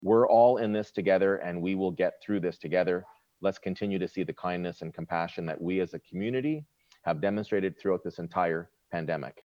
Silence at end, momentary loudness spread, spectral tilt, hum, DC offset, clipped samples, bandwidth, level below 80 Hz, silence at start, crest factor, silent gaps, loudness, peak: 0.05 s; 11 LU; -8 dB/octave; none; under 0.1%; under 0.1%; 7.2 kHz; -68 dBFS; 0 s; 18 dB; none; -29 LUFS; -10 dBFS